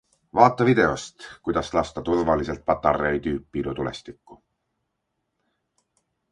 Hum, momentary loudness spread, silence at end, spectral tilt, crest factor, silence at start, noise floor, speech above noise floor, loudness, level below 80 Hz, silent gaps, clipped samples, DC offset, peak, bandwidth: none; 13 LU; 2 s; -6 dB/octave; 24 dB; 0.35 s; -78 dBFS; 55 dB; -23 LUFS; -46 dBFS; none; under 0.1%; under 0.1%; 0 dBFS; 11 kHz